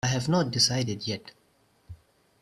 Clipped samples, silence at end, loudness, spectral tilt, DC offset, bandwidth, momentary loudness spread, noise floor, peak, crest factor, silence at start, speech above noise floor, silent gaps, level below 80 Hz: under 0.1%; 0.45 s; -26 LUFS; -4 dB/octave; under 0.1%; 13 kHz; 11 LU; -66 dBFS; -10 dBFS; 20 dB; 0.05 s; 39 dB; none; -58 dBFS